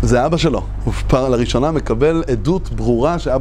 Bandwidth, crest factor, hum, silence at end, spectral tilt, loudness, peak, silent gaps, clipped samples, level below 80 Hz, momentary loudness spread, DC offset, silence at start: 11 kHz; 14 dB; none; 0 s; -6.5 dB/octave; -17 LUFS; -2 dBFS; none; under 0.1%; -24 dBFS; 4 LU; under 0.1%; 0 s